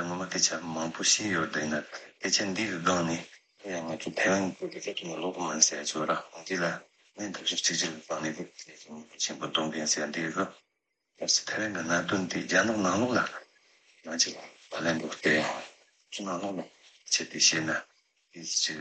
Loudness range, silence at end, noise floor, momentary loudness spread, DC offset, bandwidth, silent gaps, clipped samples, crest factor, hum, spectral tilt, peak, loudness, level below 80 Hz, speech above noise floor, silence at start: 3 LU; 0 s; -81 dBFS; 16 LU; under 0.1%; 8.8 kHz; none; under 0.1%; 24 dB; none; -2 dB/octave; -6 dBFS; -29 LUFS; -74 dBFS; 51 dB; 0 s